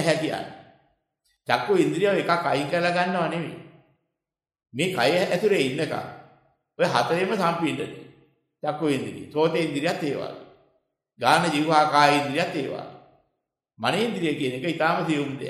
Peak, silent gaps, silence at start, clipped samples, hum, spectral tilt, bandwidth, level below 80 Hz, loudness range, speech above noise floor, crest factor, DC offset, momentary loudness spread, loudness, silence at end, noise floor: -4 dBFS; none; 0 s; under 0.1%; none; -5 dB/octave; 14.5 kHz; -70 dBFS; 4 LU; 65 dB; 22 dB; under 0.1%; 14 LU; -24 LUFS; 0 s; -88 dBFS